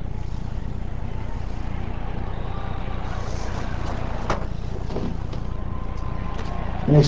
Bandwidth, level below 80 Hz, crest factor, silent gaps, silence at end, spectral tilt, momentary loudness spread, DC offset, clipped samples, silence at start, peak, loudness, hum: 7.8 kHz; -30 dBFS; 20 dB; none; 0 s; -7.5 dB/octave; 4 LU; 4%; under 0.1%; 0 s; -4 dBFS; -30 LUFS; none